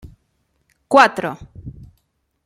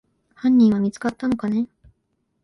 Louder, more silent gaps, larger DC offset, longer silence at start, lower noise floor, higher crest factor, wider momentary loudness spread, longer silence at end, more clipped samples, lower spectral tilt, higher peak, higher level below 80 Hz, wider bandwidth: first, -15 LUFS vs -20 LUFS; neither; neither; first, 0.9 s vs 0.45 s; second, -68 dBFS vs -72 dBFS; first, 20 dB vs 14 dB; first, 25 LU vs 10 LU; about the same, 0.75 s vs 0.8 s; neither; second, -4.5 dB/octave vs -7.5 dB/octave; first, 0 dBFS vs -8 dBFS; first, -50 dBFS vs -56 dBFS; first, 14.5 kHz vs 11 kHz